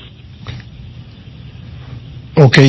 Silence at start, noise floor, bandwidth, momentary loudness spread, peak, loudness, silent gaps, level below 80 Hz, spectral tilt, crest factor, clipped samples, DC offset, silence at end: 0.45 s; -34 dBFS; 8 kHz; 23 LU; 0 dBFS; -12 LUFS; none; -40 dBFS; -6.5 dB/octave; 16 dB; 1%; under 0.1%; 0 s